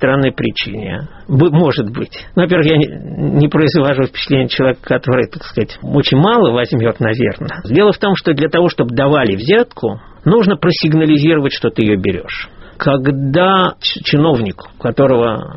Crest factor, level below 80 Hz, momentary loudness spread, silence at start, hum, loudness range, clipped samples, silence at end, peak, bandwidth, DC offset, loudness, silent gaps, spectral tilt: 14 dB; -40 dBFS; 10 LU; 0 s; none; 2 LU; under 0.1%; 0 s; 0 dBFS; 6 kHz; under 0.1%; -13 LUFS; none; -5 dB/octave